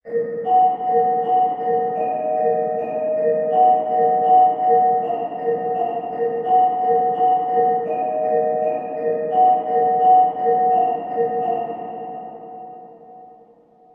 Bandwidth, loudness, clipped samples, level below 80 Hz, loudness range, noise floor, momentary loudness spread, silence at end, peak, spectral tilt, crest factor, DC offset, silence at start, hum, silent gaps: 3.2 kHz; -19 LUFS; under 0.1%; -70 dBFS; 2 LU; -51 dBFS; 9 LU; 0.7 s; -6 dBFS; -9 dB/octave; 14 dB; under 0.1%; 0.05 s; none; none